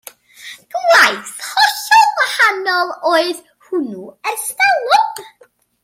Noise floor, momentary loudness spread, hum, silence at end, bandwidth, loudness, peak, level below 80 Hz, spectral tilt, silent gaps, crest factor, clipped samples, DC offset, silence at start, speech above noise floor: -52 dBFS; 16 LU; none; 0.55 s; 16.5 kHz; -14 LUFS; 0 dBFS; -72 dBFS; -0.5 dB/octave; none; 16 dB; under 0.1%; under 0.1%; 0.4 s; 36 dB